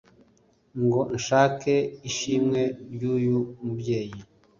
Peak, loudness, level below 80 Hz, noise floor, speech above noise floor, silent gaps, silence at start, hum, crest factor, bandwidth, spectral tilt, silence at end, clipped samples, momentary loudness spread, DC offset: -6 dBFS; -25 LUFS; -60 dBFS; -62 dBFS; 37 dB; none; 0.75 s; none; 20 dB; 7.4 kHz; -5.5 dB/octave; 0.35 s; under 0.1%; 11 LU; under 0.1%